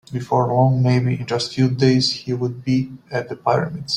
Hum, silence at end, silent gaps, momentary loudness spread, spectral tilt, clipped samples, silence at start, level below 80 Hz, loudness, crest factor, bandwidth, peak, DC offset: none; 0 s; none; 8 LU; -6.5 dB/octave; under 0.1%; 0.1 s; -54 dBFS; -19 LUFS; 16 dB; 10 kHz; -2 dBFS; under 0.1%